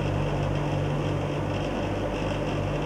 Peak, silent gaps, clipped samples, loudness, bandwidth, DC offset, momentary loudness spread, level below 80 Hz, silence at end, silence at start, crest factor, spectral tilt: -14 dBFS; none; under 0.1%; -28 LUFS; 11 kHz; under 0.1%; 2 LU; -38 dBFS; 0 s; 0 s; 12 dB; -7 dB/octave